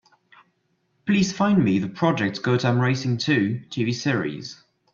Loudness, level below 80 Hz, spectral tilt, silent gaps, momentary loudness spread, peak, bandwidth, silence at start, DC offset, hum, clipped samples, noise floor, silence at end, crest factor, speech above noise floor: -22 LUFS; -60 dBFS; -6 dB/octave; none; 8 LU; -6 dBFS; 7.6 kHz; 1.05 s; under 0.1%; none; under 0.1%; -70 dBFS; 0.4 s; 16 dB; 48 dB